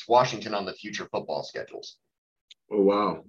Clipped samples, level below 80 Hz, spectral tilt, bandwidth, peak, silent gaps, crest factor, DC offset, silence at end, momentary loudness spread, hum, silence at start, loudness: under 0.1%; -74 dBFS; -5 dB/octave; 7.4 kHz; -8 dBFS; 2.18-2.48 s; 20 dB; under 0.1%; 0.05 s; 17 LU; none; 0 s; -27 LUFS